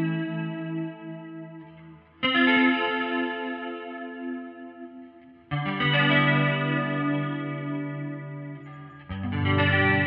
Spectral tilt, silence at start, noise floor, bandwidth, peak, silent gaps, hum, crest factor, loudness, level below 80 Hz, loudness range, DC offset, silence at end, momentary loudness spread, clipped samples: -9.5 dB/octave; 0 s; -49 dBFS; 5.2 kHz; -8 dBFS; none; none; 18 dB; -25 LUFS; -62 dBFS; 4 LU; under 0.1%; 0 s; 22 LU; under 0.1%